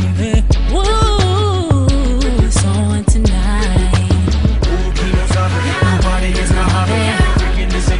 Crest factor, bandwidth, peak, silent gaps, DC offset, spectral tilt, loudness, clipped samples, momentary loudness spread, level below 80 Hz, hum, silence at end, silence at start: 12 dB; 11 kHz; 0 dBFS; none; under 0.1%; -5.5 dB/octave; -14 LUFS; under 0.1%; 3 LU; -16 dBFS; none; 0 s; 0 s